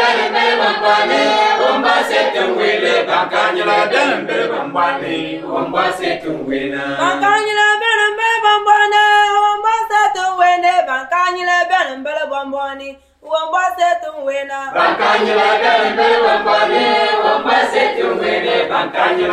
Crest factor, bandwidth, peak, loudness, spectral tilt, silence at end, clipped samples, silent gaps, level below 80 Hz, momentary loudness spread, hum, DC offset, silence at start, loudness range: 14 dB; 13 kHz; 0 dBFS; -14 LUFS; -3 dB/octave; 0 s; under 0.1%; none; -56 dBFS; 9 LU; none; under 0.1%; 0 s; 5 LU